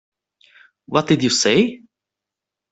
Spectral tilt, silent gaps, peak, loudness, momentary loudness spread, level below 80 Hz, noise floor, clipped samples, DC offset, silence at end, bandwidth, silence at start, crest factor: -4 dB/octave; none; -2 dBFS; -17 LUFS; 7 LU; -58 dBFS; -86 dBFS; under 0.1%; under 0.1%; 0.95 s; 8.4 kHz; 0.9 s; 20 dB